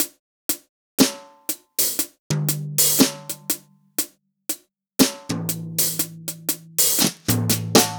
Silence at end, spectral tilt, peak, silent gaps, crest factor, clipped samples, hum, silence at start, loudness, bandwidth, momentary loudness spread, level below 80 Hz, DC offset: 0 s; -3 dB/octave; -2 dBFS; 0.19-0.49 s, 0.69-0.98 s, 2.19-2.30 s; 20 dB; under 0.1%; none; 0 s; -21 LUFS; over 20 kHz; 13 LU; -56 dBFS; under 0.1%